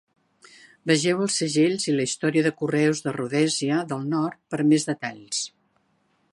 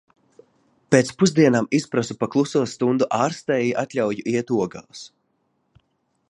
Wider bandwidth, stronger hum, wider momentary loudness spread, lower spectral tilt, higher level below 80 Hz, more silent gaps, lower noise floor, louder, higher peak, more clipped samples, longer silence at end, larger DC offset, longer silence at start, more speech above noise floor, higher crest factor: about the same, 11.5 kHz vs 11.5 kHz; neither; about the same, 8 LU vs 8 LU; about the same, -4.5 dB/octave vs -5.5 dB/octave; second, -72 dBFS vs -64 dBFS; neither; about the same, -68 dBFS vs -70 dBFS; second, -24 LUFS vs -21 LUFS; second, -6 dBFS vs -2 dBFS; neither; second, 0.85 s vs 1.25 s; neither; about the same, 0.85 s vs 0.9 s; second, 44 dB vs 49 dB; about the same, 20 dB vs 20 dB